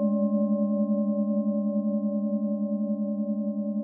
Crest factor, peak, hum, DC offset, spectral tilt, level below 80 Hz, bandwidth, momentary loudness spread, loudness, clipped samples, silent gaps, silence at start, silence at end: 10 dB; -16 dBFS; none; under 0.1%; -16.5 dB/octave; under -90 dBFS; 1.2 kHz; 4 LU; -27 LUFS; under 0.1%; none; 0 s; 0 s